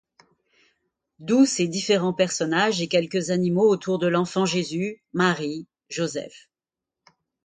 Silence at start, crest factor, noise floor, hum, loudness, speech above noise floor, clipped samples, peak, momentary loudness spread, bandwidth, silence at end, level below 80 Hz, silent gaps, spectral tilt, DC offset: 1.2 s; 20 dB; -89 dBFS; none; -23 LUFS; 66 dB; under 0.1%; -6 dBFS; 11 LU; 9.6 kHz; 1.05 s; -68 dBFS; none; -4.5 dB/octave; under 0.1%